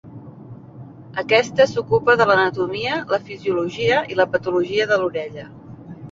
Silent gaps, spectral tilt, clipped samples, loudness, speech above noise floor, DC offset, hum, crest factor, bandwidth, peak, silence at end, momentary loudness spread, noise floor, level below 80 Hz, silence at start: none; -5 dB/octave; under 0.1%; -19 LUFS; 21 dB; under 0.1%; none; 18 dB; 7.6 kHz; -2 dBFS; 0 s; 24 LU; -39 dBFS; -56 dBFS; 0.05 s